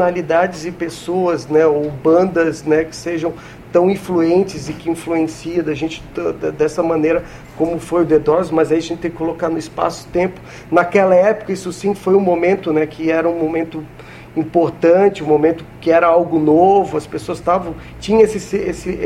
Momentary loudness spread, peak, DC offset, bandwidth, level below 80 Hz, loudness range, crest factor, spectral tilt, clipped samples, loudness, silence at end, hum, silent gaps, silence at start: 11 LU; 0 dBFS; under 0.1%; 13 kHz; -44 dBFS; 4 LU; 16 dB; -6.5 dB/octave; under 0.1%; -16 LUFS; 0 s; none; none; 0 s